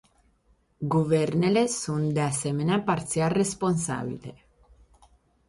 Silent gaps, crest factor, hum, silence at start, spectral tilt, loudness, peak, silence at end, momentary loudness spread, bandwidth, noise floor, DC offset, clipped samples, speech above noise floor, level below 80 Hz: none; 16 dB; none; 0.8 s; -5.5 dB/octave; -26 LUFS; -12 dBFS; 1.15 s; 10 LU; 11.5 kHz; -65 dBFS; under 0.1%; under 0.1%; 40 dB; -58 dBFS